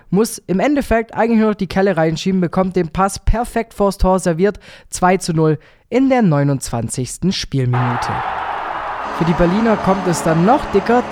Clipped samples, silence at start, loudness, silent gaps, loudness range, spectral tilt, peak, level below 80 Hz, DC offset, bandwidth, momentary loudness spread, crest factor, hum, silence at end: under 0.1%; 0.1 s; -17 LUFS; none; 2 LU; -6 dB/octave; 0 dBFS; -30 dBFS; under 0.1%; 16 kHz; 8 LU; 16 dB; none; 0 s